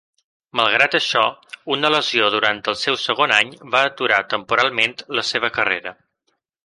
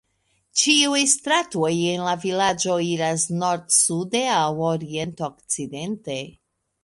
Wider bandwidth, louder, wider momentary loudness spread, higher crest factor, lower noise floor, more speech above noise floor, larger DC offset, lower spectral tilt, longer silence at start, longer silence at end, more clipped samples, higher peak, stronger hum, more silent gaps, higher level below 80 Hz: about the same, 11.5 kHz vs 11.5 kHz; first, -18 LUFS vs -21 LUFS; second, 7 LU vs 13 LU; about the same, 20 dB vs 20 dB; about the same, -71 dBFS vs -69 dBFS; first, 52 dB vs 46 dB; neither; about the same, -2.5 dB/octave vs -2.5 dB/octave; about the same, 0.55 s vs 0.55 s; first, 0.75 s vs 0.5 s; neither; first, 0 dBFS vs -4 dBFS; neither; neither; about the same, -64 dBFS vs -62 dBFS